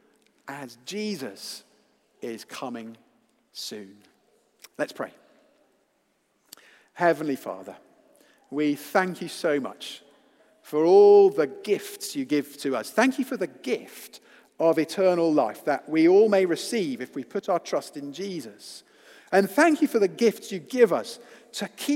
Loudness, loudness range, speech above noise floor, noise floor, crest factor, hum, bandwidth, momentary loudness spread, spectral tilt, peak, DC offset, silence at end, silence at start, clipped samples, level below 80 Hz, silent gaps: -24 LUFS; 17 LU; 46 dB; -70 dBFS; 22 dB; none; 16.5 kHz; 20 LU; -5 dB/octave; -4 dBFS; under 0.1%; 0 s; 0.45 s; under 0.1%; -84 dBFS; none